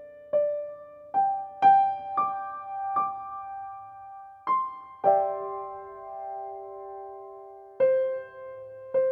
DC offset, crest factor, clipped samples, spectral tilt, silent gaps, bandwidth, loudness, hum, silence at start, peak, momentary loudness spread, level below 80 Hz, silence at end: under 0.1%; 18 dB; under 0.1%; -7 dB/octave; none; 4.3 kHz; -27 LUFS; none; 0 s; -10 dBFS; 20 LU; -74 dBFS; 0 s